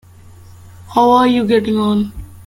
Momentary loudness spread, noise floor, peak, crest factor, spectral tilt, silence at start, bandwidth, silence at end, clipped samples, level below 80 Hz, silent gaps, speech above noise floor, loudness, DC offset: 9 LU; -40 dBFS; 0 dBFS; 16 dB; -6.5 dB/octave; 0.8 s; 15.5 kHz; 0.15 s; under 0.1%; -42 dBFS; none; 27 dB; -14 LUFS; under 0.1%